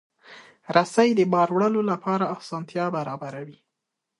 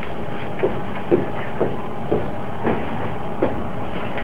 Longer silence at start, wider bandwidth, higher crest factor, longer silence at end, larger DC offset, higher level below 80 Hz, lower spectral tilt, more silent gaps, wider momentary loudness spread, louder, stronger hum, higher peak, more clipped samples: first, 0.3 s vs 0 s; second, 11.5 kHz vs 15.5 kHz; about the same, 20 dB vs 20 dB; first, 0.7 s vs 0 s; second, under 0.1% vs 7%; second, -72 dBFS vs -42 dBFS; second, -6 dB/octave vs -8 dB/octave; neither; first, 15 LU vs 7 LU; about the same, -23 LUFS vs -24 LUFS; neither; about the same, -4 dBFS vs -2 dBFS; neither